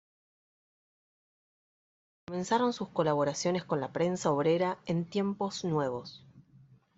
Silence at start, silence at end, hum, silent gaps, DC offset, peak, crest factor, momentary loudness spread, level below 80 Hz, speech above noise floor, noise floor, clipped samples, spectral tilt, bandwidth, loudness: 2.3 s; 0.55 s; none; none; under 0.1%; -14 dBFS; 20 dB; 7 LU; -72 dBFS; 29 dB; -60 dBFS; under 0.1%; -5.5 dB/octave; 8.2 kHz; -31 LUFS